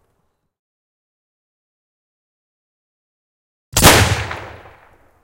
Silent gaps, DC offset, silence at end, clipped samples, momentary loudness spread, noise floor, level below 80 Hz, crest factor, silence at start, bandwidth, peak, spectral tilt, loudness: none; under 0.1%; 0.75 s; under 0.1%; 19 LU; -67 dBFS; -32 dBFS; 22 dB; 3.75 s; 16 kHz; 0 dBFS; -3 dB/octave; -12 LUFS